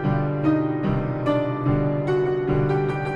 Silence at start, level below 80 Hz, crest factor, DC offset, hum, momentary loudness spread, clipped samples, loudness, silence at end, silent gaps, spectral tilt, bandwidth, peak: 0 s; -40 dBFS; 12 dB; under 0.1%; none; 2 LU; under 0.1%; -23 LUFS; 0 s; none; -9.5 dB/octave; 5.6 kHz; -10 dBFS